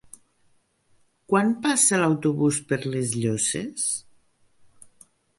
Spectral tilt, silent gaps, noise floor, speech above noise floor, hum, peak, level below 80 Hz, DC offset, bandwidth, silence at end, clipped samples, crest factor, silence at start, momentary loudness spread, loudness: -4 dB/octave; none; -64 dBFS; 41 dB; none; -6 dBFS; -64 dBFS; under 0.1%; 12 kHz; 1.4 s; under 0.1%; 20 dB; 1.3 s; 8 LU; -23 LUFS